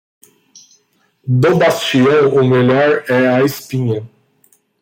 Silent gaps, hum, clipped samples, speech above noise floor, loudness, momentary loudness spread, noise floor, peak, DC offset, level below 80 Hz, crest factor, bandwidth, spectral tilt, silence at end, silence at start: none; none; under 0.1%; 46 dB; -13 LUFS; 9 LU; -58 dBFS; -2 dBFS; under 0.1%; -56 dBFS; 12 dB; 16.5 kHz; -6.5 dB/octave; 0.75 s; 1.25 s